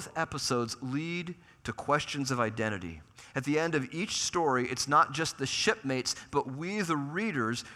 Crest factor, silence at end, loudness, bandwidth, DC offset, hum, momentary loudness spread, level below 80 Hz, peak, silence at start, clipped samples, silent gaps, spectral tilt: 22 dB; 0 s; -31 LUFS; 15.5 kHz; under 0.1%; none; 10 LU; -64 dBFS; -10 dBFS; 0 s; under 0.1%; none; -4 dB/octave